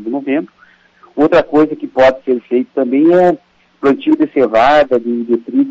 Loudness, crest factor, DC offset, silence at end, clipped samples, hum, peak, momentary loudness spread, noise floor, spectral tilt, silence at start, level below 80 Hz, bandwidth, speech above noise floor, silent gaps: -13 LUFS; 10 dB; under 0.1%; 0 s; under 0.1%; none; -2 dBFS; 9 LU; -47 dBFS; -7 dB/octave; 0 s; -48 dBFS; 7.6 kHz; 35 dB; none